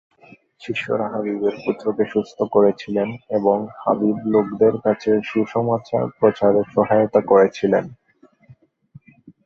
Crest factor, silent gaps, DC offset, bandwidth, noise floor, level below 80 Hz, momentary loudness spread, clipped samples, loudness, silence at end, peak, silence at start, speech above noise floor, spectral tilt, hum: 18 dB; none; under 0.1%; 7.2 kHz; -54 dBFS; -60 dBFS; 8 LU; under 0.1%; -19 LUFS; 0.15 s; -2 dBFS; 0.6 s; 36 dB; -8 dB/octave; none